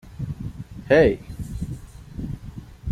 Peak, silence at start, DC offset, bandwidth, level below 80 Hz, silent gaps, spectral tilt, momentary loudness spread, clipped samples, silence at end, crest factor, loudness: -4 dBFS; 0.05 s; under 0.1%; 14.5 kHz; -40 dBFS; none; -7.5 dB/octave; 22 LU; under 0.1%; 0 s; 20 dB; -24 LUFS